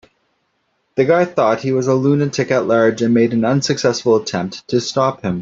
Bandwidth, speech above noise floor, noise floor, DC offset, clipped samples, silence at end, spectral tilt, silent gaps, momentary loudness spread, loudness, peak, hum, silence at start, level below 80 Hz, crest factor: 7.8 kHz; 51 dB; -66 dBFS; under 0.1%; under 0.1%; 0 s; -5.5 dB/octave; none; 5 LU; -16 LUFS; -2 dBFS; none; 0.95 s; -56 dBFS; 14 dB